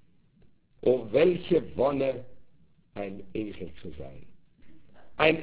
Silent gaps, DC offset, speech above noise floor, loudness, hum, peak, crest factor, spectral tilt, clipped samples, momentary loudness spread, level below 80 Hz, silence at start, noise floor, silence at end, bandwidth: none; 0.6%; 32 dB; -28 LUFS; none; -6 dBFS; 24 dB; -10 dB/octave; under 0.1%; 21 LU; -56 dBFS; 0 s; -60 dBFS; 0 s; 4 kHz